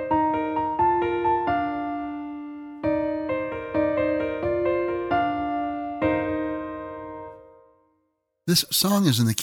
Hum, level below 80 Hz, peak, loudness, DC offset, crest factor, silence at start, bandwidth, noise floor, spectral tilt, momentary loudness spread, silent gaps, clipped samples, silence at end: none; -52 dBFS; -2 dBFS; -24 LUFS; under 0.1%; 24 dB; 0 s; 18 kHz; -73 dBFS; -4.5 dB/octave; 15 LU; none; under 0.1%; 0 s